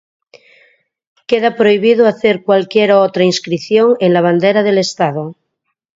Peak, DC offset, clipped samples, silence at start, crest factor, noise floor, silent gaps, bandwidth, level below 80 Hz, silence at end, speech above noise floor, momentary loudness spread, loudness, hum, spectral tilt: 0 dBFS; under 0.1%; under 0.1%; 1.3 s; 14 dB; -71 dBFS; none; 7.8 kHz; -62 dBFS; 0.65 s; 60 dB; 7 LU; -12 LUFS; none; -5.5 dB/octave